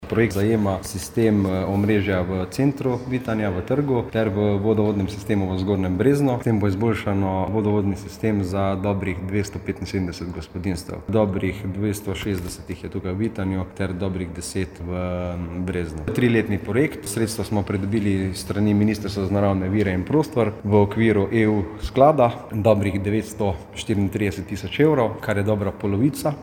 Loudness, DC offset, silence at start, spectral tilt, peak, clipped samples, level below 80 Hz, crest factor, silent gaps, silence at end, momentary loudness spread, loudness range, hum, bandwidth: -22 LUFS; under 0.1%; 0 s; -7 dB/octave; -2 dBFS; under 0.1%; -44 dBFS; 20 dB; none; 0 s; 9 LU; 6 LU; none; 18 kHz